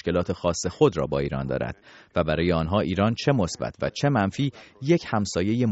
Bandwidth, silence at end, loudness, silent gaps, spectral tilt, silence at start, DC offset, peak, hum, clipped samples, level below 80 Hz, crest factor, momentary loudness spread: 8 kHz; 0 s; -25 LUFS; none; -6 dB/octave; 0.05 s; under 0.1%; -4 dBFS; none; under 0.1%; -46 dBFS; 20 dB; 7 LU